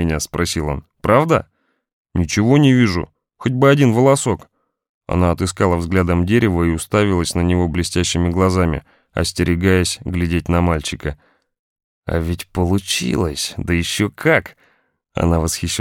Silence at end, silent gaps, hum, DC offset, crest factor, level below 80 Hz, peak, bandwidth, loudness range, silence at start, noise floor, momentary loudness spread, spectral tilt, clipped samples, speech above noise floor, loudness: 0 s; 1.93-2.05 s, 4.89-5.01 s, 11.59-11.76 s, 11.84-12.02 s; none; under 0.1%; 16 dB; -34 dBFS; 0 dBFS; 16.5 kHz; 5 LU; 0 s; -58 dBFS; 10 LU; -5.5 dB/octave; under 0.1%; 42 dB; -17 LUFS